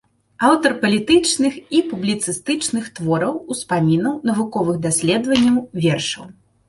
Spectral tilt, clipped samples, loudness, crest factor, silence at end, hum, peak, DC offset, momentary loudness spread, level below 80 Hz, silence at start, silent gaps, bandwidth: -4.5 dB/octave; under 0.1%; -18 LUFS; 18 dB; 0.35 s; none; 0 dBFS; under 0.1%; 7 LU; -54 dBFS; 0.4 s; none; 11.5 kHz